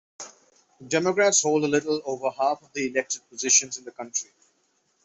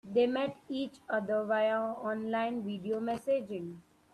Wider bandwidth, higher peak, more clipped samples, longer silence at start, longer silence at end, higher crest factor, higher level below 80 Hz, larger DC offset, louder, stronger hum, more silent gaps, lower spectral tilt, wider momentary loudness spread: second, 8.4 kHz vs 12.5 kHz; first, -6 dBFS vs -18 dBFS; neither; first, 0.2 s vs 0.05 s; first, 0.8 s vs 0.35 s; about the same, 20 dB vs 16 dB; about the same, -72 dBFS vs -74 dBFS; neither; first, -24 LUFS vs -33 LUFS; neither; neither; second, -2 dB/octave vs -6.5 dB/octave; first, 17 LU vs 9 LU